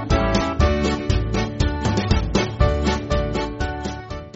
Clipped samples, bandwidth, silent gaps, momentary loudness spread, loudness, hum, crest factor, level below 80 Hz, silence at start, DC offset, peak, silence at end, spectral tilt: under 0.1%; 8 kHz; none; 7 LU; -22 LUFS; none; 16 dB; -26 dBFS; 0 s; under 0.1%; -4 dBFS; 0.05 s; -5.5 dB/octave